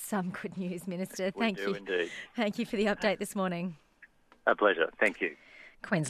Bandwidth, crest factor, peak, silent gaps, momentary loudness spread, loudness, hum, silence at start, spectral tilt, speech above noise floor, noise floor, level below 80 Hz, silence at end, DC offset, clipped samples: 14.5 kHz; 22 dB; -10 dBFS; none; 11 LU; -32 LUFS; none; 0 s; -5 dB/octave; 29 dB; -60 dBFS; -66 dBFS; 0 s; under 0.1%; under 0.1%